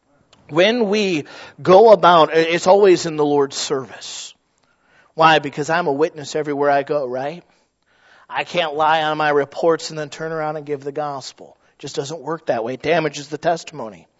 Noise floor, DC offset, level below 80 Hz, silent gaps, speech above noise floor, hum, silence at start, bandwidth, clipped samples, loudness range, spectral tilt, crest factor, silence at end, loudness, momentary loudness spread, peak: -62 dBFS; under 0.1%; -66 dBFS; none; 45 dB; none; 0.5 s; 8 kHz; under 0.1%; 10 LU; -4.5 dB/octave; 18 dB; 0.25 s; -17 LUFS; 17 LU; 0 dBFS